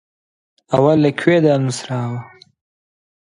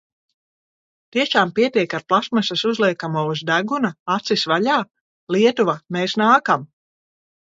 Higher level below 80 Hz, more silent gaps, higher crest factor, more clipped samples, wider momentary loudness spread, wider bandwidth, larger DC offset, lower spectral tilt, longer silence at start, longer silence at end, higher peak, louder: first, -58 dBFS vs -68 dBFS; second, none vs 3.99-4.06 s, 5.01-5.27 s; about the same, 18 dB vs 20 dB; neither; first, 11 LU vs 7 LU; first, 11 kHz vs 7.8 kHz; neither; first, -6.5 dB/octave vs -5 dB/octave; second, 0.7 s vs 1.15 s; first, 1 s vs 0.8 s; about the same, 0 dBFS vs -2 dBFS; first, -16 LUFS vs -19 LUFS